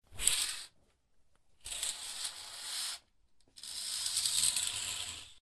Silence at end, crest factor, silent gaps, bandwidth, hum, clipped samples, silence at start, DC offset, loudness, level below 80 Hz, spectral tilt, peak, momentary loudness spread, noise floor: 0.05 s; 30 dB; none; 13.5 kHz; none; under 0.1%; 0.1 s; under 0.1%; -34 LUFS; -62 dBFS; 2 dB/octave; -8 dBFS; 15 LU; -69 dBFS